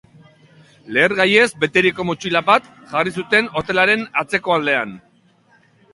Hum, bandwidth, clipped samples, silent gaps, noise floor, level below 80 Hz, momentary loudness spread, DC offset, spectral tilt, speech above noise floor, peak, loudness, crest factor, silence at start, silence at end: none; 11.5 kHz; under 0.1%; none; -55 dBFS; -56 dBFS; 8 LU; under 0.1%; -4.5 dB/octave; 38 dB; 0 dBFS; -17 LUFS; 20 dB; 0.85 s; 0.95 s